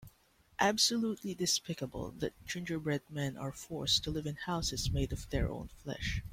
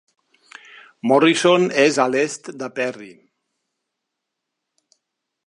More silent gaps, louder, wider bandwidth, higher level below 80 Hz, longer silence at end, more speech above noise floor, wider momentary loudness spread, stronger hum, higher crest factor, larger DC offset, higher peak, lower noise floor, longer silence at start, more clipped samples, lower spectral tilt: neither; second, -35 LUFS vs -18 LUFS; first, 16.5 kHz vs 11.5 kHz; first, -48 dBFS vs -76 dBFS; second, 0 s vs 2.35 s; second, 32 dB vs 62 dB; second, 12 LU vs 15 LU; neither; about the same, 20 dB vs 20 dB; neither; second, -14 dBFS vs -2 dBFS; second, -67 dBFS vs -80 dBFS; second, 0 s vs 1.05 s; neither; about the same, -3.5 dB/octave vs -4 dB/octave